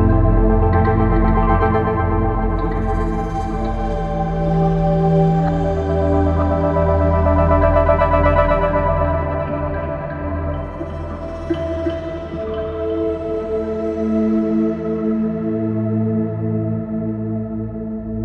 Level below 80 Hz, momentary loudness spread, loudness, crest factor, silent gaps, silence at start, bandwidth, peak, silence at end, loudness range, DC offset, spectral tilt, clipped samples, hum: -24 dBFS; 10 LU; -19 LUFS; 16 dB; none; 0 s; 6.6 kHz; -2 dBFS; 0 s; 8 LU; under 0.1%; -10 dB/octave; under 0.1%; none